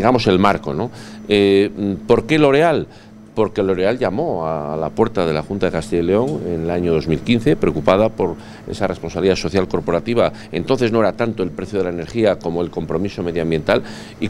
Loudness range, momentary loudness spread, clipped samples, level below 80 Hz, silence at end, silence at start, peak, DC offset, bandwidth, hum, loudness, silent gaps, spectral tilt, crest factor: 3 LU; 9 LU; under 0.1%; -42 dBFS; 0 s; 0 s; 0 dBFS; under 0.1%; 12 kHz; none; -18 LUFS; none; -6.5 dB/octave; 18 dB